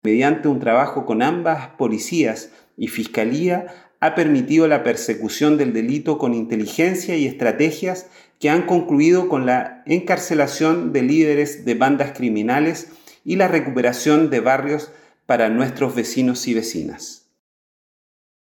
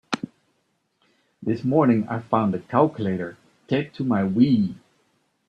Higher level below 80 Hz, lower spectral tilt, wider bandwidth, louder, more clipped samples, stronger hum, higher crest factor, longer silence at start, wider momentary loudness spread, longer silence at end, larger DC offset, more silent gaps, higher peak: second, -68 dBFS vs -62 dBFS; second, -5.5 dB/octave vs -8 dB/octave; first, 18 kHz vs 8.6 kHz; first, -19 LUFS vs -23 LUFS; neither; neither; about the same, 14 dB vs 18 dB; about the same, 0.05 s vs 0.1 s; about the same, 10 LU vs 12 LU; first, 1.3 s vs 0.7 s; neither; neither; about the same, -4 dBFS vs -4 dBFS